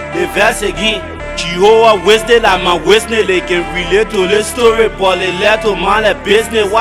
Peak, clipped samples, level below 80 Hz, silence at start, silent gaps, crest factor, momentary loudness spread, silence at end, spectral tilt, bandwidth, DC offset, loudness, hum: 0 dBFS; 0.8%; -30 dBFS; 0 s; none; 12 dB; 7 LU; 0 s; -3.5 dB/octave; 15 kHz; under 0.1%; -11 LUFS; none